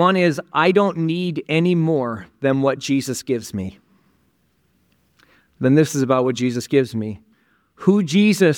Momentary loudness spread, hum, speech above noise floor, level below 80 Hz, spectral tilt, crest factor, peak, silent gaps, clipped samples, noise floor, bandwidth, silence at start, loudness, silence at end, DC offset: 11 LU; none; 45 dB; -62 dBFS; -6 dB/octave; 18 dB; -2 dBFS; none; under 0.1%; -63 dBFS; 17.5 kHz; 0 s; -19 LUFS; 0 s; under 0.1%